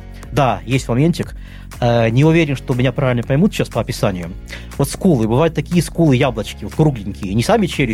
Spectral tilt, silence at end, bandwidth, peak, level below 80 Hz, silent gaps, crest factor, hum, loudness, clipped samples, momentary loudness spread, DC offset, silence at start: -6.5 dB/octave; 0 s; 16 kHz; -2 dBFS; -34 dBFS; none; 14 dB; none; -16 LUFS; under 0.1%; 12 LU; under 0.1%; 0 s